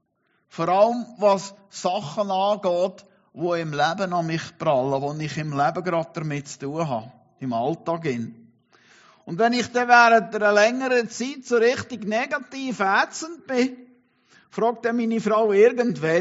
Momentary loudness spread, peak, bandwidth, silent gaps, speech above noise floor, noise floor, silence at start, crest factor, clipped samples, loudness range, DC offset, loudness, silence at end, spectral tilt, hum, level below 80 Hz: 13 LU; -2 dBFS; 8 kHz; none; 47 dB; -69 dBFS; 0.55 s; 22 dB; under 0.1%; 7 LU; under 0.1%; -22 LUFS; 0 s; -4 dB/octave; none; -70 dBFS